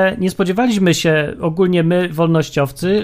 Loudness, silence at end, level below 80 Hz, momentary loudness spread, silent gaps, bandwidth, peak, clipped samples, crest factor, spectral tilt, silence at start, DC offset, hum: -16 LUFS; 0 s; -46 dBFS; 4 LU; none; 15.5 kHz; 0 dBFS; under 0.1%; 14 dB; -6 dB/octave; 0 s; under 0.1%; none